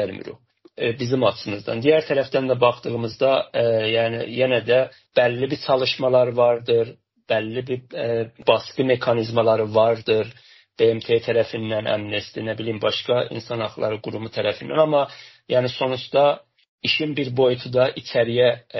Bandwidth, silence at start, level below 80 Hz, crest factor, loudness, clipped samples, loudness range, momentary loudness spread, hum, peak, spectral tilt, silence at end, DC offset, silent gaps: 6.2 kHz; 0 s; -62 dBFS; 18 dB; -21 LUFS; under 0.1%; 3 LU; 9 LU; none; -4 dBFS; -3.5 dB/octave; 0 s; under 0.1%; 16.68-16.78 s